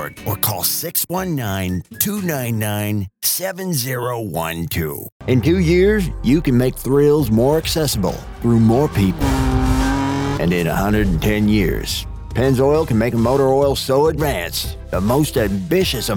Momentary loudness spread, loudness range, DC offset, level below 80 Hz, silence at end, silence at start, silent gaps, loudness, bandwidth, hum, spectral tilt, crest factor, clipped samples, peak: 8 LU; 4 LU; under 0.1%; -30 dBFS; 0 s; 0 s; 5.12-5.20 s; -18 LUFS; 19 kHz; none; -5.5 dB/octave; 16 dB; under 0.1%; 0 dBFS